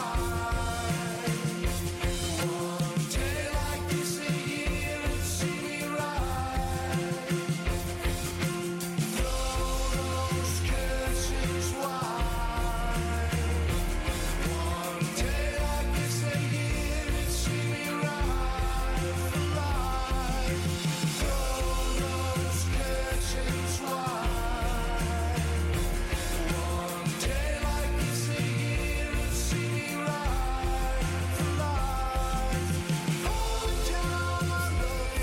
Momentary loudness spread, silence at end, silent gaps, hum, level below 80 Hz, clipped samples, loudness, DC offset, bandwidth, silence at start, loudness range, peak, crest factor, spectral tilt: 2 LU; 0 s; none; none; -34 dBFS; under 0.1%; -30 LUFS; under 0.1%; 16.5 kHz; 0 s; 1 LU; -20 dBFS; 10 dB; -4.5 dB/octave